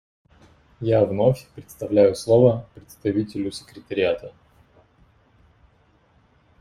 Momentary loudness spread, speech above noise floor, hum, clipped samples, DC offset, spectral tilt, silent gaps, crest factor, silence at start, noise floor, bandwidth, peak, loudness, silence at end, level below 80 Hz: 16 LU; 38 dB; none; under 0.1%; under 0.1%; -7 dB/octave; none; 20 dB; 0.8 s; -60 dBFS; 14.5 kHz; -4 dBFS; -21 LUFS; 2.3 s; -54 dBFS